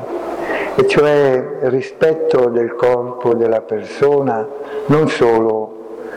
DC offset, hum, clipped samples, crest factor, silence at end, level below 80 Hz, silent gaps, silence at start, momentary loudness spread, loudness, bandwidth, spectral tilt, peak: under 0.1%; none; under 0.1%; 10 dB; 0 s; -50 dBFS; none; 0 s; 11 LU; -15 LUFS; 10.5 kHz; -7 dB/octave; -6 dBFS